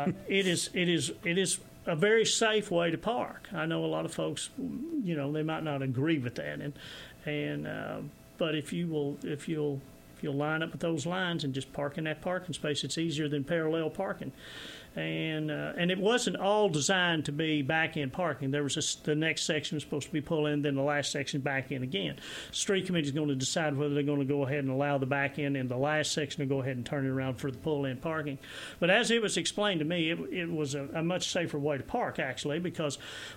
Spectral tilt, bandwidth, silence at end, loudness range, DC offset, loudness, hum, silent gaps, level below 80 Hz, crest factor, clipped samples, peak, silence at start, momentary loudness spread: -4.5 dB/octave; 16.5 kHz; 0 s; 5 LU; under 0.1%; -31 LUFS; none; none; -64 dBFS; 18 dB; under 0.1%; -12 dBFS; 0 s; 9 LU